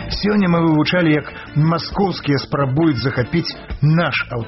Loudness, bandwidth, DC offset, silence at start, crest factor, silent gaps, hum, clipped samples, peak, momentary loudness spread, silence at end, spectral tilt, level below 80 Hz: -17 LUFS; 6 kHz; under 0.1%; 0 s; 12 dB; none; none; under 0.1%; -6 dBFS; 5 LU; 0 s; -5.5 dB/octave; -38 dBFS